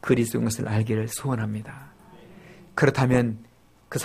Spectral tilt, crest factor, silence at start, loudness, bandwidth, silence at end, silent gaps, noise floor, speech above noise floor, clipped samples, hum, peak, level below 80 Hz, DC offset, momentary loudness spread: -6 dB/octave; 22 dB; 0.05 s; -25 LUFS; 15.5 kHz; 0 s; none; -48 dBFS; 25 dB; under 0.1%; none; -2 dBFS; -52 dBFS; under 0.1%; 15 LU